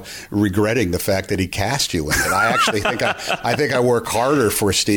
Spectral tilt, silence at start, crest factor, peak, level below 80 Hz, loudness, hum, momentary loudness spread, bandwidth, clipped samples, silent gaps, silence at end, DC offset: -4 dB/octave; 0 s; 12 dB; -6 dBFS; -40 dBFS; -18 LUFS; none; 5 LU; 18 kHz; under 0.1%; none; 0 s; under 0.1%